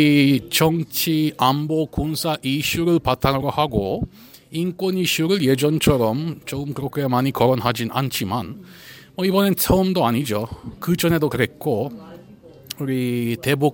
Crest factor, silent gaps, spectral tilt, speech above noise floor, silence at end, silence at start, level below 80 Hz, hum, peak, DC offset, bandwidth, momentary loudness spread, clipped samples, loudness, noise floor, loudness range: 18 dB; none; -5.5 dB/octave; 25 dB; 0 s; 0 s; -42 dBFS; none; -2 dBFS; under 0.1%; 17 kHz; 11 LU; under 0.1%; -20 LUFS; -44 dBFS; 3 LU